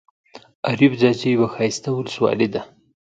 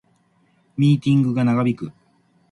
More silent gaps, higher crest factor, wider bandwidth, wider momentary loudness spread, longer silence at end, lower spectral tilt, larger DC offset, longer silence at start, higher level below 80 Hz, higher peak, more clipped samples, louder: first, 0.55-0.63 s vs none; about the same, 18 dB vs 14 dB; second, 9 kHz vs 10.5 kHz; second, 9 LU vs 16 LU; about the same, 0.5 s vs 0.6 s; second, -6 dB/octave vs -8.5 dB/octave; neither; second, 0.35 s vs 0.8 s; about the same, -60 dBFS vs -60 dBFS; first, -2 dBFS vs -6 dBFS; neither; about the same, -20 LUFS vs -19 LUFS